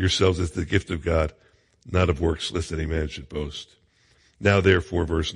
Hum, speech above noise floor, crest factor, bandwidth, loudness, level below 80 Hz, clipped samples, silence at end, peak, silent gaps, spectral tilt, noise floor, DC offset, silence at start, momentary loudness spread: none; 38 dB; 20 dB; 11 kHz; -24 LUFS; -40 dBFS; under 0.1%; 0 s; -4 dBFS; none; -5.5 dB/octave; -61 dBFS; under 0.1%; 0 s; 12 LU